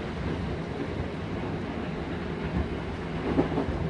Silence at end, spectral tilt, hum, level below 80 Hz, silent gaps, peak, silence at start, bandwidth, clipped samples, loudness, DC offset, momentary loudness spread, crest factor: 0 s; -8 dB/octave; none; -40 dBFS; none; -10 dBFS; 0 s; 10.5 kHz; under 0.1%; -32 LUFS; under 0.1%; 6 LU; 22 dB